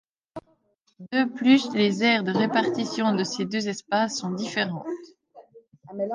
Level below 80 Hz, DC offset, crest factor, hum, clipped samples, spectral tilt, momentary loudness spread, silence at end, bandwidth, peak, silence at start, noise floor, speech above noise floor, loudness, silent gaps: -72 dBFS; under 0.1%; 18 dB; none; under 0.1%; -4.5 dB/octave; 19 LU; 0 s; 9.8 kHz; -8 dBFS; 0.35 s; -67 dBFS; 43 dB; -24 LUFS; none